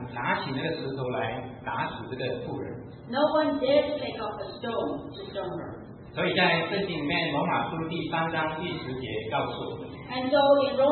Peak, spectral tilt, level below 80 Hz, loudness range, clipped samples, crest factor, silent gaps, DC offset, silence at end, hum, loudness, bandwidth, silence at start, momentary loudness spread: -10 dBFS; -10 dB/octave; -58 dBFS; 3 LU; under 0.1%; 18 dB; none; under 0.1%; 0 s; none; -28 LUFS; 4.4 kHz; 0 s; 13 LU